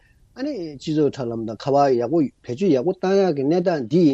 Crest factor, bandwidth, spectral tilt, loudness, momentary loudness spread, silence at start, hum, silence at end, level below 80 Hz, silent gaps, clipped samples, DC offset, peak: 14 dB; 8.2 kHz; -7.5 dB/octave; -21 LUFS; 10 LU; 0.35 s; none; 0 s; -60 dBFS; none; under 0.1%; under 0.1%; -6 dBFS